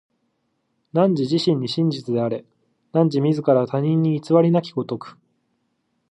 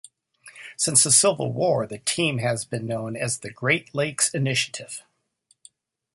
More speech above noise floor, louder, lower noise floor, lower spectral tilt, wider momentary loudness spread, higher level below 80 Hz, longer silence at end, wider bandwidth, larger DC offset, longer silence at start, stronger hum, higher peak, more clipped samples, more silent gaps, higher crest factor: first, 52 dB vs 43 dB; about the same, -20 LUFS vs -22 LUFS; first, -71 dBFS vs -66 dBFS; first, -8 dB/octave vs -2.5 dB/octave; second, 10 LU vs 15 LU; second, -70 dBFS vs -64 dBFS; second, 1 s vs 1.15 s; second, 9.6 kHz vs 12 kHz; neither; first, 0.95 s vs 0.45 s; neither; about the same, -2 dBFS vs -2 dBFS; neither; neither; second, 18 dB vs 24 dB